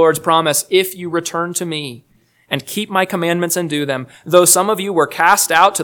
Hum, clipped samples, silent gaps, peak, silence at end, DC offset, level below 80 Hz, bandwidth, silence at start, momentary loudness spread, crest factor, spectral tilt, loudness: none; 0.2%; none; 0 dBFS; 0 s; under 0.1%; -62 dBFS; 19.5 kHz; 0 s; 12 LU; 16 dB; -3 dB/octave; -15 LUFS